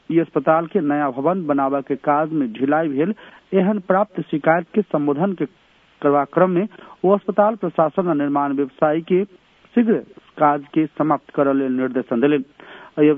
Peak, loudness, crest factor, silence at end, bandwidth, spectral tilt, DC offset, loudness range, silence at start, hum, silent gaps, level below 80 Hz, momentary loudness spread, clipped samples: -2 dBFS; -20 LUFS; 18 dB; 0 s; 3.8 kHz; -10.5 dB/octave; under 0.1%; 1 LU; 0.1 s; none; none; -68 dBFS; 5 LU; under 0.1%